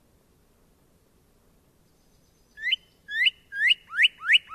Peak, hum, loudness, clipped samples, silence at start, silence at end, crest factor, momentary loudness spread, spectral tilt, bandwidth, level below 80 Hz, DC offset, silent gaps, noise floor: -8 dBFS; none; -23 LUFS; under 0.1%; 2.6 s; 0 s; 20 dB; 10 LU; 2 dB/octave; 14 kHz; -68 dBFS; under 0.1%; none; -62 dBFS